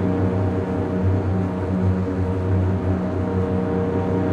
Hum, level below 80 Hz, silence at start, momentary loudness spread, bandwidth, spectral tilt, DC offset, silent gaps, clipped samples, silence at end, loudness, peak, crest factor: none; -40 dBFS; 0 s; 2 LU; 5 kHz; -10 dB/octave; under 0.1%; none; under 0.1%; 0 s; -22 LUFS; -8 dBFS; 12 dB